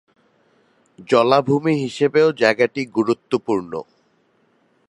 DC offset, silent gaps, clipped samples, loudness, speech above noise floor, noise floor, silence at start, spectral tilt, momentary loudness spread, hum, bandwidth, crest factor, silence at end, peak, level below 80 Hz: under 0.1%; none; under 0.1%; -18 LUFS; 43 dB; -61 dBFS; 1 s; -6 dB/octave; 8 LU; none; 11 kHz; 20 dB; 1.05 s; 0 dBFS; -66 dBFS